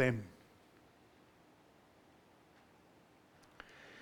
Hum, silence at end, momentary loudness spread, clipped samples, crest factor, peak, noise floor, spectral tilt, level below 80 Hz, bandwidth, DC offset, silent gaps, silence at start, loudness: none; 0 s; 13 LU; under 0.1%; 26 dB; -18 dBFS; -66 dBFS; -7 dB/octave; -76 dBFS; 18 kHz; under 0.1%; none; 0 s; -43 LUFS